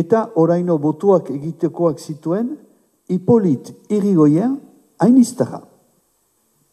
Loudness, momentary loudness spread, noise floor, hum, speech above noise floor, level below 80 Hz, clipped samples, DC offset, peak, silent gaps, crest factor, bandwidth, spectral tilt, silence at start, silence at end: -17 LUFS; 13 LU; -63 dBFS; none; 47 dB; -66 dBFS; under 0.1%; under 0.1%; -2 dBFS; none; 16 dB; 13.5 kHz; -8 dB/octave; 0 s; 1.15 s